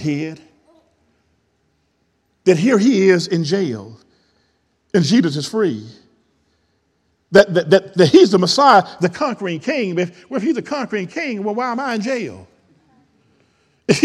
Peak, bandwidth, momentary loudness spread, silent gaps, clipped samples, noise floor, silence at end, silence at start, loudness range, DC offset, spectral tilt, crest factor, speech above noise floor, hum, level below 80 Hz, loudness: 0 dBFS; 12 kHz; 12 LU; none; under 0.1%; -65 dBFS; 0 s; 0 s; 8 LU; under 0.1%; -5.5 dB/octave; 18 dB; 49 dB; none; -62 dBFS; -16 LUFS